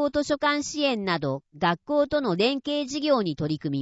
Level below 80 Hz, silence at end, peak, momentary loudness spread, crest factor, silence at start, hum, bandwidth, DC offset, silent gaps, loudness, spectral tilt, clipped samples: -56 dBFS; 0 s; -10 dBFS; 4 LU; 16 dB; 0 s; none; 8 kHz; under 0.1%; none; -25 LUFS; -5 dB/octave; under 0.1%